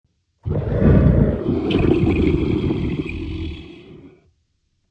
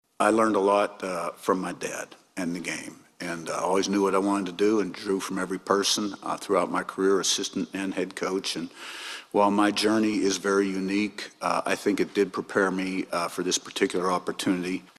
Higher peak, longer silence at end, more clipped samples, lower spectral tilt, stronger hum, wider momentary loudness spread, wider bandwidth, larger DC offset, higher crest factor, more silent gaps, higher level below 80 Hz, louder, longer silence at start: first, -2 dBFS vs -6 dBFS; first, 0.8 s vs 0.15 s; neither; first, -9.5 dB/octave vs -3.5 dB/octave; neither; first, 16 LU vs 11 LU; second, 6 kHz vs 14.5 kHz; neither; about the same, 18 dB vs 20 dB; neither; first, -28 dBFS vs -66 dBFS; first, -19 LUFS vs -26 LUFS; first, 0.45 s vs 0.2 s